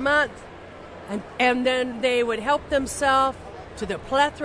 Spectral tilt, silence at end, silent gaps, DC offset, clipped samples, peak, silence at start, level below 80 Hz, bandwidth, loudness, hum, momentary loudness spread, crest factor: -3.5 dB/octave; 0 s; none; under 0.1%; under 0.1%; -8 dBFS; 0 s; -48 dBFS; 11 kHz; -23 LUFS; none; 20 LU; 16 dB